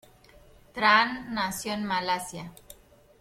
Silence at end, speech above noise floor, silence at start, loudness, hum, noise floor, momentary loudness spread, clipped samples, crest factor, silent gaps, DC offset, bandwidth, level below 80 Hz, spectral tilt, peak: 0.45 s; 28 dB; 0.75 s; -26 LUFS; none; -55 dBFS; 21 LU; under 0.1%; 24 dB; none; under 0.1%; 16.5 kHz; -58 dBFS; -3 dB/octave; -6 dBFS